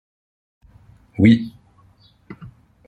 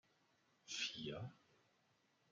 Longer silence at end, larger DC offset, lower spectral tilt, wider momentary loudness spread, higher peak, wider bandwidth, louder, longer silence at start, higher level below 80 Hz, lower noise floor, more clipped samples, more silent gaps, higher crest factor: second, 0.4 s vs 0.95 s; neither; first, -8.5 dB/octave vs -3 dB/octave; first, 26 LU vs 13 LU; first, -2 dBFS vs -30 dBFS; second, 8 kHz vs 10.5 kHz; first, -16 LUFS vs -47 LUFS; first, 1.2 s vs 0.65 s; first, -54 dBFS vs -82 dBFS; second, -54 dBFS vs -79 dBFS; neither; neither; about the same, 20 dB vs 24 dB